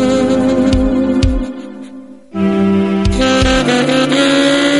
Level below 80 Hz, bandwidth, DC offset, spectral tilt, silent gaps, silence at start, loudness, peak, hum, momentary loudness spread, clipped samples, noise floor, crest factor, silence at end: -24 dBFS; 11.5 kHz; 0.5%; -5 dB/octave; none; 0 s; -12 LUFS; 0 dBFS; none; 15 LU; under 0.1%; -33 dBFS; 12 dB; 0 s